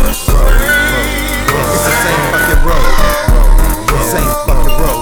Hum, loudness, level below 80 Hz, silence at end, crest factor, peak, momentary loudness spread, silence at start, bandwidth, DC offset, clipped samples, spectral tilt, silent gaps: none; -12 LUFS; -10 dBFS; 0 s; 8 dB; 0 dBFS; 3 LU; 0 s; 19.5 kHz; under 0.1%; under 0.1%; -4 dB/octave; none